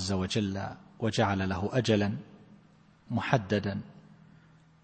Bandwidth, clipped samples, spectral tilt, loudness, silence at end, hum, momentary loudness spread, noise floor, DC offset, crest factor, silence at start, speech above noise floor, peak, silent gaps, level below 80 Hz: 8.8 kHz; under 0.1%; -6 dB/octave; -30 LUFS; 0.7 s; none; 12 LU; -60 dBFS; under 0.1%; 24 dB; 0 s; 30 dB; -6 dBFS; none; -60 dBFS